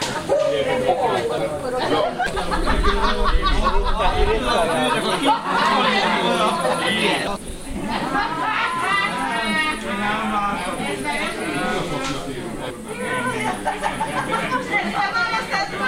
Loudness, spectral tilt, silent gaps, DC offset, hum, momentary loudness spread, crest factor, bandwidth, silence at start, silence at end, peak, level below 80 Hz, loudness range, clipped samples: -21 LUFS; -4 dB/octave; none; under 0.1%; none; 6 LU; 18 dB; 16 kHz; 0 s; 0 s; -4 dBFS; -30 dBFS; 5 LU; under 0.1%